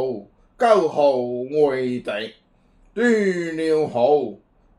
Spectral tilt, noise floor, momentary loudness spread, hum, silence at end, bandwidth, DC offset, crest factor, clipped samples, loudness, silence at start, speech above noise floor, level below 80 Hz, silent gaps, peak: -6 dB/octave; -56 dBFS; 13 LU; none; 0.45 s; 11 kHz; under 0.1%; 18 dB; under 0.1%; -20 LUFS; 0 s; 37 dB; -60 dBFS; none; -4 dBFS